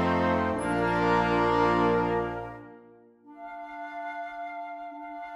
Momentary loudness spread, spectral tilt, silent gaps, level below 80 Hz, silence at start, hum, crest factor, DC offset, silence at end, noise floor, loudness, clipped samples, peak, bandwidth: 17 LU; -7 dB/octave; none; -50 dBFS; 0 s; none; 18 dB; under 0.1%; 0 s; -54 dBFS; -27 LUFS; under 0.1%; -10 dBFS; 11 kHz